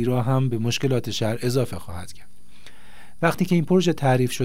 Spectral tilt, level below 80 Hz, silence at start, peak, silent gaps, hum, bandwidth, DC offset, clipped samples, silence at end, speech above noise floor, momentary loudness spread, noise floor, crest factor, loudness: -6 dB/octave; -54 dBFS; 0 s; -4 dBFS; none; none; 16 kHz; 3%; under 0.1%; 0 s; 29 dB; 14 LU; -51 dBFS; 18 dB; -22 LUFS